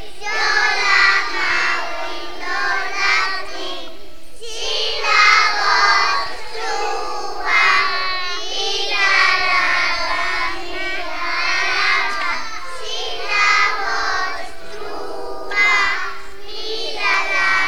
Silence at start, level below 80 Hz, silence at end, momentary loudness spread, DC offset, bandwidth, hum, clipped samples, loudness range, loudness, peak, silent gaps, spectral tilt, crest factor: 0 s; -44 dBFS; 0 s; 16 LU; 7%; 17 kHz; none; under 0.1%; 4 LU; -17 LUFS; 0 dBFS; none; -0.5 dB/octave; 20 dB